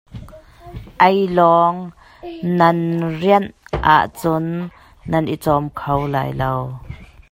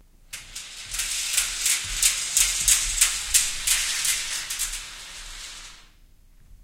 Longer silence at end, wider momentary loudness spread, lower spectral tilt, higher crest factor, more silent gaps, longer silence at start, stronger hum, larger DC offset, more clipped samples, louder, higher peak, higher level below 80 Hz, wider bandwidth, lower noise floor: first, 0.25 s vs 0 s; first, 23 LU vs 18 LU; first, -7 dB/octave vs 2.5 dB/octave; second, 18 dB vs 24 dB; neither; second, 0.1 s vs 0.3 s; neither; neither; neither; first, -17 LUFS vs -21 LUFS; about the same, 0 dBFS vs -2 dBFS; about the same, -40 dBFS vs -42 dBFS; about the same, 16 kHz vs 17 kHz; second, -40 dBFS vs -53 dBFS